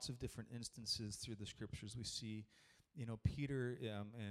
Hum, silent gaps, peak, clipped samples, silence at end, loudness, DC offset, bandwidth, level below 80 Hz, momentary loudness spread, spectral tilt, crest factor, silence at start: none; none; -26 dBFS; under 0.1%; 0 s; -47 LUFS; under 0.1%; 15 kHz; -62 dBFS; 8 LU; -4.5 dB/octave; 22 dB; 0 s